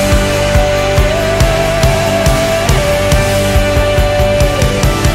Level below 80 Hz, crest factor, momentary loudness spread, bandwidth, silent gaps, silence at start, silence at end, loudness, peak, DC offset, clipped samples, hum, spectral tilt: -16 dBFS; 10 dB; 1 LU; 16.5 kHz; none; 0 s; 0 s; -11 LUFS; 0 dBFS; under 0.1%; under 0.1%; none; -5 dB/octave